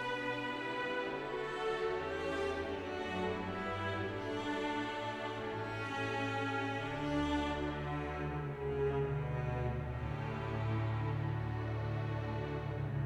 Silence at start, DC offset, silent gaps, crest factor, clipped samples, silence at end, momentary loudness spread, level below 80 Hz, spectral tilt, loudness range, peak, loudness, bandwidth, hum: 0 s; under 0.1%; none; 14 dB; under 0.1%; 0 s; 4 LU; -52 dBFS; -7 dB/octave; 1 LU; -24 dBFS; -38 LUFS; 10.5 kHz; none